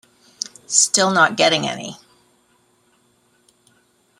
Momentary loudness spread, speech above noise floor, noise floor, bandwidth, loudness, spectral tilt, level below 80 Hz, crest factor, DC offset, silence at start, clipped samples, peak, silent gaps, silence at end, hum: 16 LU; 43 dB; -60 dBFS; 16 kHz; -16 LUFS; -1.5 dB/octave; -66 dBFS; 22 dB; under 0.1%; 0.7 s; under 0.1%; 0 dBFS; none; 2.25 s; none